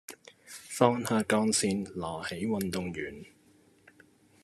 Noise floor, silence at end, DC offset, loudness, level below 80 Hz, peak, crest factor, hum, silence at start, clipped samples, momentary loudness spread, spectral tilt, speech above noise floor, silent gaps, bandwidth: -63 dBFS; 1.2 s; under 0.1%; -30 LUFS; -68 dBFS; -8 dBFS; 24 dB; none; 0.1 s; under 0.1%; 21 LU; -4.5 dB/octave; 33 dB; none; 14 kHz